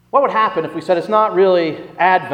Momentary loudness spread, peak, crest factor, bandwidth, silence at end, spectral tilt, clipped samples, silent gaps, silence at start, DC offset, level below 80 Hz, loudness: 6 LU; 0 dBFS; 14 dB; 9.8 kHz; 0 s; -6.5 dB/octave; under 0.1%; none; 0.15 s; under 0.1%; -64 dBFS; -16 LUFS